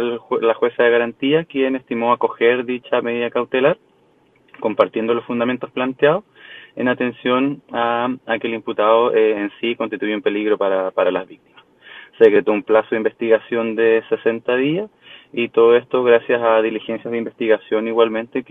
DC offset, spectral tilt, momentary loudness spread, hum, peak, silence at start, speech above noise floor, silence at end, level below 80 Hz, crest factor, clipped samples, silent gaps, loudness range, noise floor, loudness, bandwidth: under 0.1%; -8 dB/octave; 9 LU; none; 0 dBFS; 0 s; 38 dB; 0.1 s; -64 dBFS; 18 dB; under 0.1%; none; 3 LU; -56 dBFS; -18 LUFS; 3.9 kHz